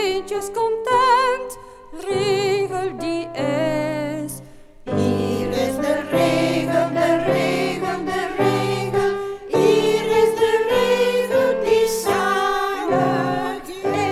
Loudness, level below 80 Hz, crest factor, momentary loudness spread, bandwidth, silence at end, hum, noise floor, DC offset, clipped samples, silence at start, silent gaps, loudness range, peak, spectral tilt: -20 LUFS; -48 dBFS; 16 dB; 9 LU; 15.5 kHz; 0 s; none; -41 dBFS; under 0.1%; under 0.1%; 0 s; none; 5 LU; -4 dBFS; -5 dB/octave